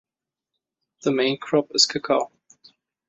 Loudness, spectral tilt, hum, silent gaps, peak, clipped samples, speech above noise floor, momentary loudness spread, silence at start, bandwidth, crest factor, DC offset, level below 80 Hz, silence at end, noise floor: -21 LUFS; -3 dB/octave; none; none; -4 dBFS; under 0.1%; 64 dB; 9 LU; 1.05 s; 8.4 kHz; 22 dB; under 0.1%; -70 dBFS; 0.85 s; -86 dBFS